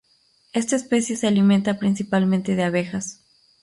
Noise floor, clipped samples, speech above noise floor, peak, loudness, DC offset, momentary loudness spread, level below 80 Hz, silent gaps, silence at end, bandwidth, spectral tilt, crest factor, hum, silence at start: -61 dBFS; under 0.1%; 41 dB; -8 dBFS; -21 LUFS; under 0.1%; 10 LU; -60 dBFS; none; 0.5 s; 11.5 kHz; -5.5 dB/octave; 14 dB; none; 0.55 s